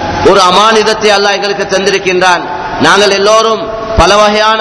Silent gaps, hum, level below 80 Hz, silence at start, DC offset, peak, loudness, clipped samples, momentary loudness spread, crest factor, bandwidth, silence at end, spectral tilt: none; none; -26 dBFS; 0 s; under 0.1%; 0 dBFS; -7 LUFS; 5%; 7 LU; 8 dB; 11 kHz; 0 s; -3 dB/octave